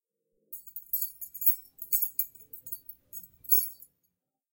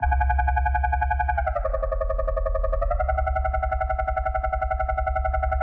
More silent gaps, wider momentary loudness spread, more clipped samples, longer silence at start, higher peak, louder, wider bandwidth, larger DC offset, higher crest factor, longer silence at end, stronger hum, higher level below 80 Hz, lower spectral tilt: neither; first, 20 LU vs 4 LU; neither; first, 0.5 s vs 0 s; about the same, -10 dBFS vs -12 dBFS; about the same, -27 LUFS vs -25 LUFS; first, 17 kHz vs 3.4 kHz; neither; first, 24 dB vs 12 dB; first, 0.8 s vs 0 s; neither; second, -78 dBFS vs -26 dBFS; second, 1.5 dB/octave vs -9 dB/octave